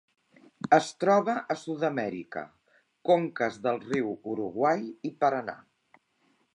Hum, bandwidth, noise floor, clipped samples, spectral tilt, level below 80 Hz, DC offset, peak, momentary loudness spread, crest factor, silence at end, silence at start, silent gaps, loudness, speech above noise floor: none; 11 kHz; -70 dBFS; under 0.1%; -5.5 dB/octave; -74 dBFS; under 0.1%; -6 dBFS; 15 LU; 22 dB; 1 s; 0.65 s; none; -28 LUFS; 43 dB